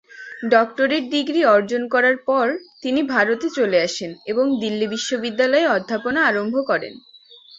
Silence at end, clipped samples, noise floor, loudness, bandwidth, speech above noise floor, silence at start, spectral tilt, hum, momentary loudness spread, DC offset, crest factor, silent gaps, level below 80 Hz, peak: 0.6 s; under 0.1%; -47 dBFS; -19 LUFS; 8 kHz; 27 dB; 0.15 s; -4 dB/octave; none; 7 LU; under 0.1%; 18 dB; none; -64 dBFS; -2 dBFS